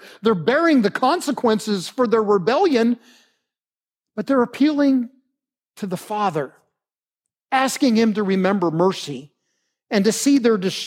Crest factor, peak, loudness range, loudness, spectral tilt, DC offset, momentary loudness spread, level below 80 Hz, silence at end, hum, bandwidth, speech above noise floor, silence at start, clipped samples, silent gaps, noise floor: 16 dB; -4 dBFS; 4 LU; -19 LUFS; -5 dB/octave; under 0.1%; 12 LU; -74 dBFS; 0 s; none; 16 kHz; over 71 dB; 0 s; under 0.1%; none; under -90 dBFS